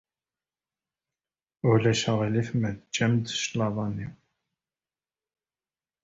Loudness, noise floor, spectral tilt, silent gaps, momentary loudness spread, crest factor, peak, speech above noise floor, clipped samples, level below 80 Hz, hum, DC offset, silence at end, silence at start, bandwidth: -26 LUFS; under -90 dBFS; -5.5 dB/octave; none; 9 LU; 20 dB; -10 dBFS; over 64 dB; under 0.1%; -58 dBFS; none; under 0.1%; 1.9 s; 1.65 s; 8 kHz